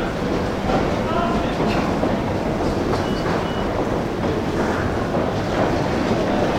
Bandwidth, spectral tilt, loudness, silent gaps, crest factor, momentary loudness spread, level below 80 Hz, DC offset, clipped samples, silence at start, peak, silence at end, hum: 16.5 kHz; -6.5 dB/octave; -21 LUFS; none; 14 dB; 2 LU; -34 dBFS; under 0.1%; under 0.1%; 0 s; -6 dBFS; 0 s; none